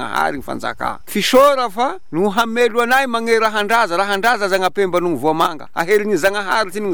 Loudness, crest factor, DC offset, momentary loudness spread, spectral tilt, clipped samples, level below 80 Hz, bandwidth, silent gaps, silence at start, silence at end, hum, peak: -16 LUFS; 14 dB; 3%; 8 LU; -3.5 dB/octave; under 0.1%; -50 dBFS; over 20 kHz; none; 0 s; 0 s; none; -2 dBFS